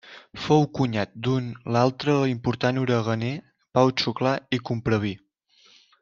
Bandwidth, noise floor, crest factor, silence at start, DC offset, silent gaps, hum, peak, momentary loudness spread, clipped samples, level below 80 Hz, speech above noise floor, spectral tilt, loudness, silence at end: 7.4 kHz; -59 dBFS; 20 dB; 0.05 s; under 0.1%; none; none; -4 dBFS; 9 LU; under 0.1%; -58 dBFS; 36 dB; -6.5 dB/octave; -24 LUFS; 0.85 s